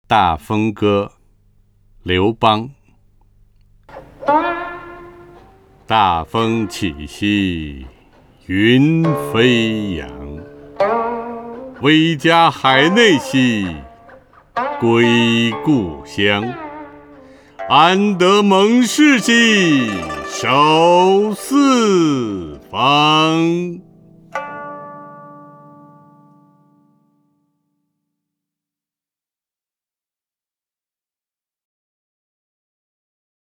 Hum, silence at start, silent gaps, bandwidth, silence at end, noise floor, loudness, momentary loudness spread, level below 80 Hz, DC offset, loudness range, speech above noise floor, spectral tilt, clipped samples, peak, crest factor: none; 0.1 s; none; 18 kHz; 8.15 s; under -90 dBFS; -14 LUFS; 19 LU; -46 dBFS; under 0.1%; 9 LU; over 76 dB; -5 dB/octave; under 0.1%; 0 dBFS; 18 dB